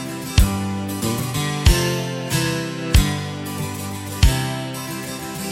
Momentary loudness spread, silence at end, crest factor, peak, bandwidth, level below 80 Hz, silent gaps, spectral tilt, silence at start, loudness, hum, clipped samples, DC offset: 10 LU; 0 s; 20 dB; 0 dBFS; 16.5 kHz; -24 dBFS; none; -4.5 dB/octave; 0 s; -22 LUFS; none; under 0.1%; under 0.1%